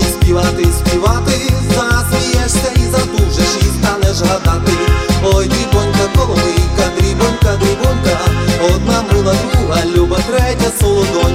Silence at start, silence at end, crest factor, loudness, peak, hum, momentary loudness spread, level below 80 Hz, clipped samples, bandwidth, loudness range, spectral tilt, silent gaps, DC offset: 0 s; 0 s; 12 dB; -13 LUFS; 0 dBFS; none; 1 LU; -18 dBFS; under 0.1%; 16.5 kHz; 0 LU; -5 dB/octave; none; under 0.1%